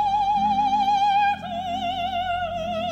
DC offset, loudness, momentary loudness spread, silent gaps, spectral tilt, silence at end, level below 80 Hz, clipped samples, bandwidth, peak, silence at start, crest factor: under 0.1%; -23 LUFS; 7 LU; none; -4.5 dB/octave; 0 s; -50 dBFS; under 0.1%; 8.2 kHz; -12 dBFS; 0 s; 10 dB